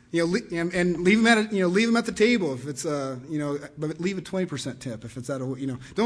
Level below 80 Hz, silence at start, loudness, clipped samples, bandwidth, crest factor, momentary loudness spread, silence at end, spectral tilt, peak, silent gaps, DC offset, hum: -58 dBFS; 0.15 s; -25 LUFS; under 0.1%; 11 kHz; 18 dB; 13 LU; 0 s; -5 dB/octave; -6 dBFS; none; under 0.1%; none